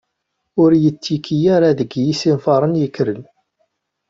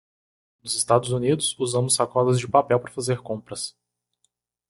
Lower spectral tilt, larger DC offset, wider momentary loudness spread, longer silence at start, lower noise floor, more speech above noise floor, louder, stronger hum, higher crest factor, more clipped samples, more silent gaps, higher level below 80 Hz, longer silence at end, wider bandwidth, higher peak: first, -7 dB/octave vs -4.5 dB/octave; neither; second, 9 LU vs 12 LU; about the same, 0.55 s vs 0.65 s; about the same, -74 dBFS vs -73 dBFS; first, 59 dB vs 50 dB; first, -16 LUFS vs -23 LUFS; second, none vs 60 Hz at -40 dBFS; second, 14 dB vs 20 dB; neither; neither; about the same, -56 dBFS vs -60 dBFS; second, 0.85 s vs 1 s; second, 7.6 kHz vs 12 kHz; about the same, -2 dBFS vs -4 dBFS